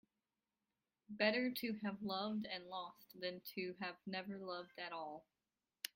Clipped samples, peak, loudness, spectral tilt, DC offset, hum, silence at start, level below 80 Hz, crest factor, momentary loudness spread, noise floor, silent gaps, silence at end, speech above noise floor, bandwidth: under 0.1%; -20 dBFS; -44 LUFS; -4.5 dB/octave; under 0.1%; none; 1.1 s; -84 dBFS; 24 dB; 12 LU; under -90 dBFS; none; 0.05 s; over 46 dB; 16.5 kHz